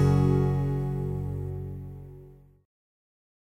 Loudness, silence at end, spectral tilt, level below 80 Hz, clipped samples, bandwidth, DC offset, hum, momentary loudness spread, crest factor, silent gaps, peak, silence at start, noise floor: -28 LUFS; 1.25 s; -9.5 dB/octave; -42 dBFS; under 0.1%; 6.6 kHz; under 0.1%; none; 20 LU; 16 dB; none; -14 dBFS; 0 s; -51 dBFS